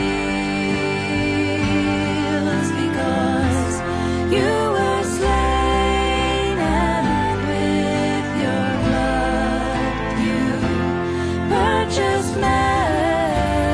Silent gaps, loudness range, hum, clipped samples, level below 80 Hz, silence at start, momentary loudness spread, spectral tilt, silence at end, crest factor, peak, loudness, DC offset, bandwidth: none; 1 LU; none; under 0.1%; -30 dBFS; 0 s; 3 LU; -5.5 dB/octave; 0 s; 14 dB; -4 dBFS; -19 LUFS; under 0.1%; 11 kHz